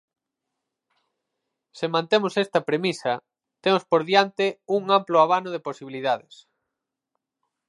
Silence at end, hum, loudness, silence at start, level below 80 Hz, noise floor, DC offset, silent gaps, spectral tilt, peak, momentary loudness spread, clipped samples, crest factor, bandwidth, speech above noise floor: 1.5 s; none; -23 LUFS; 1.75 s; -78 dBFS; -84 dBFS; under 0.1%; none; -5 dB/octave; -2 dBFS; 11 LU; under 0.1%; 22 dB; 11.5 kHz; 61 dB